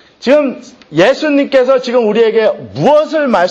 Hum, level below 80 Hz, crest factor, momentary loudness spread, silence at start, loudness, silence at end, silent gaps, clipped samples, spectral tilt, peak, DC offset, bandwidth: none; -56 dBFS; 12 dB; 5 LU; 0.2 s; -11 LUFS; 0 s; none; under 0.1%; -5.5 dB/octave; 0 dBFS; under 0.1%; 8.2 kHz